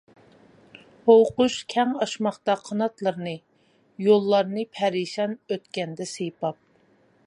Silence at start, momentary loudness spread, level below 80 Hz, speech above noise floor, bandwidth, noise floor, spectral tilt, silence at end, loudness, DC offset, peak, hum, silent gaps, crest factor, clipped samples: 1.05 s; 14 LU; -68 dBFS; 38 dB; 11 kHz; -61 dBFS; -5 dB/octave; 0.75 s; -24 LUFS; under 0.1%; -4 dBFS; none; none; 20 dB; under 0.1%